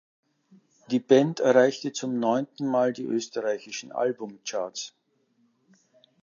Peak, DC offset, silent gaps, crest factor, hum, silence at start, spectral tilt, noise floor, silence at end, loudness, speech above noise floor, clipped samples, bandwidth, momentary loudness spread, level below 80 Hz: -6 dBFS; under 0.1%; none; 22 dB; none; 0.9 s; -5 dB/octave; -69 dBFS; 1.35 s; -26 LUFS; 44 dB; under 0.1%; 7.4 kHz; 14 LU; -80 dBFS